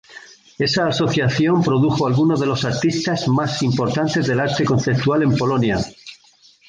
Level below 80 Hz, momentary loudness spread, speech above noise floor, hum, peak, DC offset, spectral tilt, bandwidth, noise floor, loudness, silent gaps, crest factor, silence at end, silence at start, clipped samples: -48 dBFS; 3 LU; 34 dB; none; -6 dBFS; under 0.1%; -6 dB/octave; 9.6 kHz; -52 dBFS; -18 LUFS; none; 12 dB; 0.55 s; 0.1 s; under 0.1%